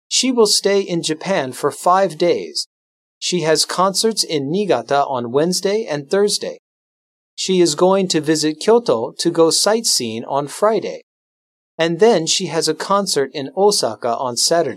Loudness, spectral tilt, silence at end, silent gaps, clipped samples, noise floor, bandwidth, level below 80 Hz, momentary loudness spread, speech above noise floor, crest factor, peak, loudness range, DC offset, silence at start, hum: -17 LUFS; -3 dB/octave; 0 s; 2.66-3.21 s, 6.59-7.37 s, 11.03-11.78 s; under 0.1%; under -90 dBFS; 16 kHz; -72 dBFS; 8 LU; over 73 dB; 16 dB; -2 dBFS; 3 LU; under 0.1%; 0.1 s; none